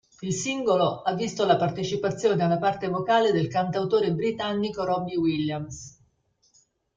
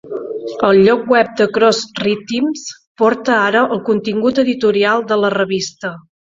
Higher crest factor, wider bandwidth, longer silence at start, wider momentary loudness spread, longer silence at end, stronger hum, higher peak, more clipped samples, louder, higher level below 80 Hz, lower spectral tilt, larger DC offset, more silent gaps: first, 20 dB vs 14 dB; first, 9.4 kHz vs 7.8 kHz; first, 0.2 s vs 0.05 s; second, 7 LU vs 13 LU; first, 1.05 s vs 0.4 s; neither; second, -6 dBFS vs 0 dBFS; neither; second, -25 LUFS vs -15 LUFS; about the same, -60 dBFS vs -56 dBFS; about the same, -5.5 dB/octave vs -4.5 dB/octave; neither; second, none vs 2.87-2.95 s